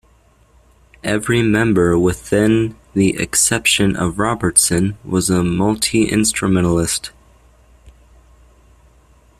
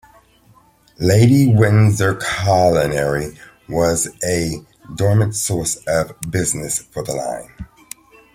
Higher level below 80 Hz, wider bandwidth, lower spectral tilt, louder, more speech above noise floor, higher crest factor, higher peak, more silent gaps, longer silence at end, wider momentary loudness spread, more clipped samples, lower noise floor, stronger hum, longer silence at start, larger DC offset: about the same, -40 dBFS vs -44 dBFS; about the same, 15.5 kHz vs 16 kHz; second, -4 dB/octave vs -5.5 dB/octave; about the same, -16 LUFS vs -17 LUFS; about the same, 37 dB vs 35 dB; about the same, 18 dB vs 16 dB; about the same, 0 dBFS vs -2 dBFS; neither; first, 1.5 s vs 0.7 s; second, 7 LU vs 19 LU; neither; about the same, -52 dBFS vs -52 dBFS; neither; about the same, 1.05 s vs 1 s; neither